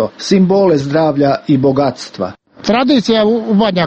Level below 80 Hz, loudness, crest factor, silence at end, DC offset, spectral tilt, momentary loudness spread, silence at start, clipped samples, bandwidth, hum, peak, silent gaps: -48 dBFS; -13 LUFS; 12 dB; 0 s; under 0.1%; -6.5 dB/octave; 12 LU; 0 s; under 0.1%; 8.6 kHz; none; 0 dBFS; none